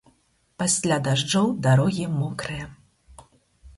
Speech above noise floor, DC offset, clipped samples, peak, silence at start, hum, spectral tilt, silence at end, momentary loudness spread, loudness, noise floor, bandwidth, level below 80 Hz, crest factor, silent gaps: 42 dB; under 0.1%; under 0.1%; -6 dBFS; 0.6 s; none; -4.5 dB/octave; 0.05 s; 12 LU; -23 LUFS; -65 dBFS; 11.5 kHz; -54 dBFS; 18 dB; none